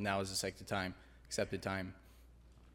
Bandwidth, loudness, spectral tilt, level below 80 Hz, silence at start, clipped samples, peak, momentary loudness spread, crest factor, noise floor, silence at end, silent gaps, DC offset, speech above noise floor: 17 kHz; -40 LUFS; -4 dB/octave; -62 dBFS; 0 s; under 0.1%; -20 dBFS; 14 LU; 22 dB; -61 dBFS; 0 s; none; under 0.1%; 21 dB